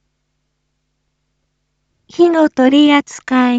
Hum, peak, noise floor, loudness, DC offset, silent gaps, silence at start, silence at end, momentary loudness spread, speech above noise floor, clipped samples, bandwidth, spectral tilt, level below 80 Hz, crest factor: none; 0 dBFS; -69 dBFS; -12 LUFS; under 0.1%; none; 2.2 s; 0 s; 7 LU; 58 dB; under 0.1%; 8 kHz; -3.5 dB/octave; -60 dBFS; 14 dB